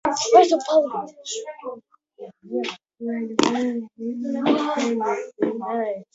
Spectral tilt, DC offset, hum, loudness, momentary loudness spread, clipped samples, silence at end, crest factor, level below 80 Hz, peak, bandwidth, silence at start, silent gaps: -3.5 dB/octave; under 0.1%; none; -22 LUFS; 19 LU; under 0.1%; 0.1 s; 22 dB; -68 dBFS; -2 dBFS; 8 kHz; 0.05 s; none